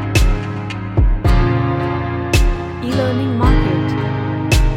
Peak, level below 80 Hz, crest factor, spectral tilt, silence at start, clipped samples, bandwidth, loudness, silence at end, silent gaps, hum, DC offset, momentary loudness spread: 0 dBFS; -18 dBFS; 14 dB; -6 dB/octave; 0 s; under 0.1%; 16 kHz; -17 LUFS; 0 s; none; none; under 0.1%; 6 LU